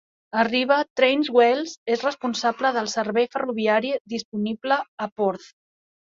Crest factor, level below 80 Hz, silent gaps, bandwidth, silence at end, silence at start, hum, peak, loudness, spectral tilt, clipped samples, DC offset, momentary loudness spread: 18 dB; -70 dBFS; 0.90-0.96 s, 1.77-1.86 s, 4.00-4.05 s, 4.25-4.32 s, 4.88-4.98 s, 5.12-5.16 s; 7.6 kHz; 0.65 s; 0.35 s; none; -4 dBFS; -23 LUFS; -4 dB/octave; under 0.1%; under 0.1%; 10 LU